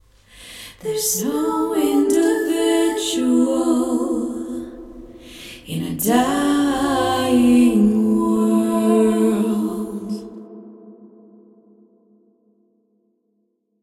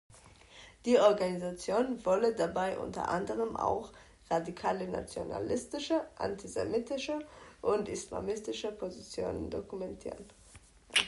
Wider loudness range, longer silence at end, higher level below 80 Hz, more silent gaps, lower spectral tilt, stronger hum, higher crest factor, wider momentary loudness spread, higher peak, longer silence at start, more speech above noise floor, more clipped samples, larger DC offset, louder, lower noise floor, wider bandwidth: about the same, 8 LU vs 6 LU; first, 2.75 s vs 0 s; first, -50 dBFS vs -58 dBFS; neither; about the same, -4.5 dB/octave vs -4 dB/octave; neither; about the same, 18 dB vs 22 dB; first, 20 LU vs 12 LU; first, -2 dBFS vs -12 dBFS; first, 0.4 s vs 0.1 s; first, 50 dB vs 25 dB; neither; neither; first, -18 LUFS vs -34 LUFS; first, -69 dBFS vs -58 dBFS; first, 16 kHz vs 11.5 kHz